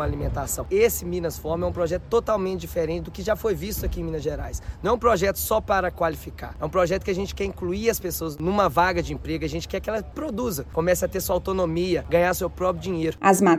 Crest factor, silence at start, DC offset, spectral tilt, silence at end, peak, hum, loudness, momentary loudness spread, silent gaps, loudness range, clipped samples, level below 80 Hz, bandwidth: 18 dB; 0 s; under 0.1%; -5 dB/octave; 0 s; -4 dBFS; none; -25 LUFS; 8 LU; none; 2 LU; under 0.1%; -38 dBFS; 17 kHz